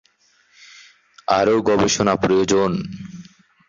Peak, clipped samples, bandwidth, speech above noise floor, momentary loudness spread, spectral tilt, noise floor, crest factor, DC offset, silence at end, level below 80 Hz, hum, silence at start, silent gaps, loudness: -2 dBFS; under 0.1%; 7.6 kHz; 42 dB; 16 LU; -4.5 dB/octave; -59 dBFS; 18 dB; under 0.1%; 0.45 s; -50 dBFS; none; 1.3 s; none; -18 LUFS